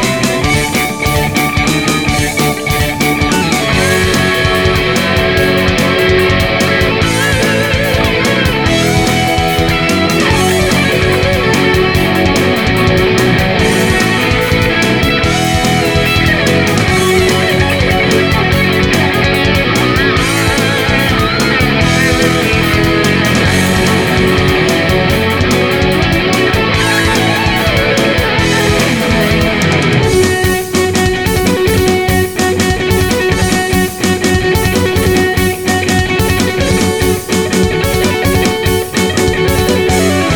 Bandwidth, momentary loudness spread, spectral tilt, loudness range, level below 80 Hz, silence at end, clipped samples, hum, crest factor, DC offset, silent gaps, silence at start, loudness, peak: over 20 kHz; 2 LU; -4.5 dB/octave; 2 LU; -24 dBFS; 0 s; under 0.1%; none; 10 dB; 0.8%; none; 0 s; -11 LUFS; 0 dBFS